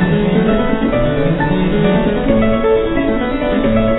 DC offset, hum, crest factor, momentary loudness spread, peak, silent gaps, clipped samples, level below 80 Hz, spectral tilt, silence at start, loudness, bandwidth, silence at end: under 0.1%; none; 12 dB; 3 LU; 0 dBFS; none; under 0.1%; -24 dBFS; -11.5 dB/octave; 0 s; -14 LUFS; 4.1 kHz; 0 s